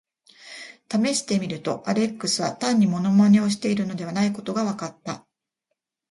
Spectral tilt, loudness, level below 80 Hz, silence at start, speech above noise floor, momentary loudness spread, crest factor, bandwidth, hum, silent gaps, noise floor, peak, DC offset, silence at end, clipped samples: -5 dB/octave; -23 LUFS; -66 dBFS; 0.45 s; 58 dB; 17 LU; 16 dB; 11.5 kHz; none; none; -80 dBFS; -8 dBFS; under 0.1%; 0.95 s; under 0.1%